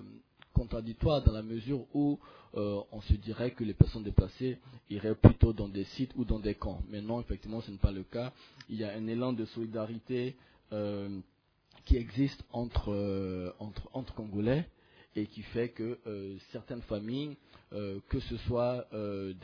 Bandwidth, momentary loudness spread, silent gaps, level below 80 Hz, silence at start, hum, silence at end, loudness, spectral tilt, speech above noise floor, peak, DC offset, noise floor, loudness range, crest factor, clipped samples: 5.4 kHz; 14 LU; none; -40 dBFS; 0 s; none; 0 s; -34 LUFS; -8 dB/octave; 32 dB; -2 dBFS; under 0.1%; -64 dBFS; 8 LU; 30 dB; under 0.1%